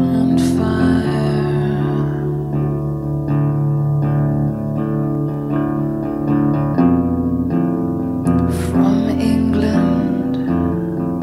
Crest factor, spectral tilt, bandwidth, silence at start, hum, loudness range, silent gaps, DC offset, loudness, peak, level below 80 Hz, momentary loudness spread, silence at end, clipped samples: 14 dB; -8.5 dB/octave; 13 kHz; 0 s; none; 2 LU; none; under 0.1%; -17 LUFS; -4 dBFS; -36 dBFS; 5 LU; 0 s; under 0.1%